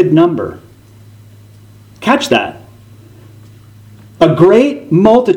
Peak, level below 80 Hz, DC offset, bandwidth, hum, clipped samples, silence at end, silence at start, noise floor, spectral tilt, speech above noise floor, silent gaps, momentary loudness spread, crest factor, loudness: 0 dBFS; -48 dBFS; under 0.1%; 15.5 kHz; none; 0.3%; 0 s; 0 s; -39 dBFS; -6.5 dB/octave; 30 dB; none; 13 LU; 14 dB; -11 LUFS